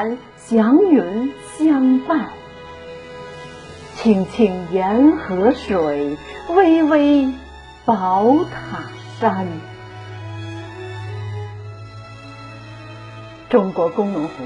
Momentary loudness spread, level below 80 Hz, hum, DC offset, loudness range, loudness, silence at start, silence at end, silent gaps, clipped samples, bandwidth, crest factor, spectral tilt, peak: 22 LU; -48 dBFS; none; under 0.1%; 14 LU; -17 LUFS; 0 s; 0 s; none; under 0.1%; 11 kHz; 18 dB; -7.5 dB/octave; -2 dBFS